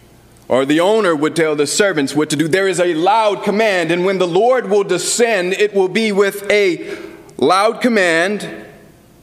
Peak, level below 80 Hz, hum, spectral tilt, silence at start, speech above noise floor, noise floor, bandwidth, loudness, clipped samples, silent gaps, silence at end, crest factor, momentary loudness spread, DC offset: -2 dBFS; -58 dBFS; none; -4 dB/octave; 0.5 s; 29 dB; -43 dBFS; 15.5 kHz; -15 LUFS; under 0.1%; none; 0.5 s; 14 dB; 6 LU; under 0.1%